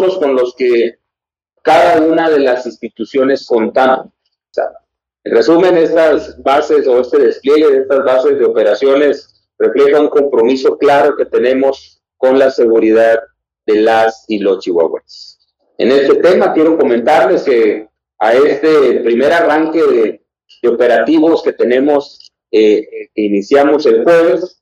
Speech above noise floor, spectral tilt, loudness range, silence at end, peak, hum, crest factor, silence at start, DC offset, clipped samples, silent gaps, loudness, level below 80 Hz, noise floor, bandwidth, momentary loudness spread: 73 dB; -5.5 dB/octave; 2 LU; 0.15 s; 0 dBFS; none; 10 dB; 0 s; under 0.1%; under 0.1%; none; -11 LUFS; -56 dBFS; -83 dBFS; 9.2 kHz; 8 LU